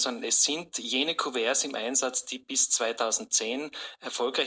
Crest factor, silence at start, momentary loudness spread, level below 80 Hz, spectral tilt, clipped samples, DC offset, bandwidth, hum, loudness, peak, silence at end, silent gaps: 16 dB; 0 s; 9 LU; -78 dBFS; 0.5 dB/octave; under 0.1%; under 0.1%; 8 kHz; none; -26 LUFS; -12 dBFS; 0 s; none